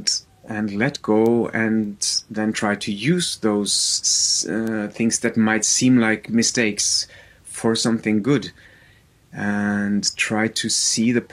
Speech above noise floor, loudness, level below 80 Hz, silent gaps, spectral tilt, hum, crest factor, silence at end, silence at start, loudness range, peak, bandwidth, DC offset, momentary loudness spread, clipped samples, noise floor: 33 dB; -20 LUFS; -58 dBFS; none; -3 dB/octave; none; 18 dB; 0.05 s; 0 s; 4 LU; -4 dBFS; 15 kHz; under 0.1%; 9 LU; under 0.1%; -53 dBFS